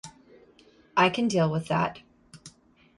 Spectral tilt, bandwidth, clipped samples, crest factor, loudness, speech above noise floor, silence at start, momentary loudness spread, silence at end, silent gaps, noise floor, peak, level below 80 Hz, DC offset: -5.5 dB/octave; 11.5 kHz; under 0.1%; 20 dB; -26 LUFS; 33 dB; 0.05 s; 8 LU; 0.5 s; none; -58 dBFS; -8 dBFS; -64 dBFS; under 0.1%